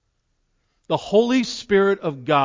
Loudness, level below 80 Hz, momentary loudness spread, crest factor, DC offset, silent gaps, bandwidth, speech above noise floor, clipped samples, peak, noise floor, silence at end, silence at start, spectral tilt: -20 LUFS; -58 dBFS; 8 LU; 16 dB; under 0.1%; none; 7.6 kHz; 51 dB; under 0.1%; -4 dBFS; -70 dBFS; 0 s; 0.9 s; -5.5 dB/octave